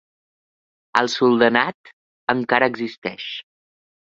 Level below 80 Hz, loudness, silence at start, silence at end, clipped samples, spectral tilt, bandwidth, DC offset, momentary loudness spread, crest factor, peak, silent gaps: -66 dBFS; -20 LUFS; 0.95 s; 0.75 s; under 0.1%; -4.5 dB/octave; 7.8 kHz; under 0.1%; 14 LU; 22 dB; 0 dBFS; 1.74-1.84 s, 1.93-2.27 s, 2.98-3.02 s